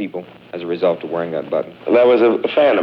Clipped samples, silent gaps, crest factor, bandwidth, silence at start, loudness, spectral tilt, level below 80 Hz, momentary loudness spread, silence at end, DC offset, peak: under 0.1%; none; 14 dB; 5.6 kHz; 0 s; -17 LUFS; -8 dB/octave; -64 dBFS; 16 LU; 0 s; under 0.1%; -4 dBFS